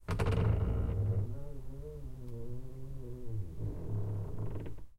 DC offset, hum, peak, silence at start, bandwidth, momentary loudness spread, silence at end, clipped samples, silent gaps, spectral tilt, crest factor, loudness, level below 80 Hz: under 0.1%; none; -20 dBFS; 0 s; 11.5 kHz; 15 LU; 0.05 s; under 0.1%; none; -8.5 dB/octave; 16 dB; -38 LUFS; -42 dBFS